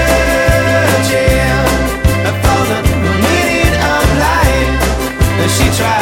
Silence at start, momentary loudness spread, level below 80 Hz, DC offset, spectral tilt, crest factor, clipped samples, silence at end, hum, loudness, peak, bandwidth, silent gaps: 0 s; 3 LU; -18 dBFS; under 0.1%; -5 dB/octave; 10 dB; under 0.1%; 0 s; none; -12 LUFS; 0 dBFS; 17 kHz; none